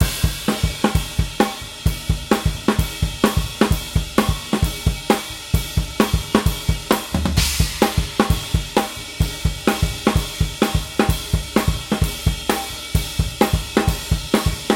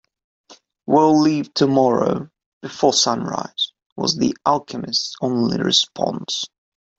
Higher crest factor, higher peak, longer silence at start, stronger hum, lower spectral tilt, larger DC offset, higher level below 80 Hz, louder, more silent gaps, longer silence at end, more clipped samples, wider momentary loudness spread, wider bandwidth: about the same, 18 dB vs 18 dB; about the same, -2 dBFS vs -2 dBFS; second, 0 s vs 0.5 s; neither; about the same, -5 dB/octave vs -4 dB/octave; neither; first, -26 dBFS vs -60 dBFS; about the same, -21 LUFS vs -19 LUFS; second, none vs 2.46-2.61 s, 3.86-3.96 s; second, 0 s vs 0.5 s; neither; second, 5 LU vs 11 LU; first, 17 kHz vs 8 kHz